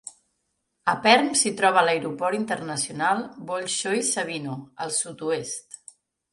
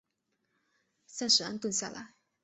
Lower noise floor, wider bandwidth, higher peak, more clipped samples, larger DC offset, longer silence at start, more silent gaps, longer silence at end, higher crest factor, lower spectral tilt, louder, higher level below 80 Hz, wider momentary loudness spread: second, -76 dBFS vs -81 dBFS; first, 11.5 kHz vs 8.4 kHz; first, -4 dBFS vs -10 dBFS; neither; neither; second, 0.05 s vs 1.1 s; neither; first, 0.55 s vs 0.35 s; about the same, 22 dB vs 26 dB; about the same, -2.5 dB/octave vs -1.5 dB/octave; first, -24 LUFS vs -29 LUFS; first, -72 dBFS vs -78 dBFS; second, 16 LU vs 19 LU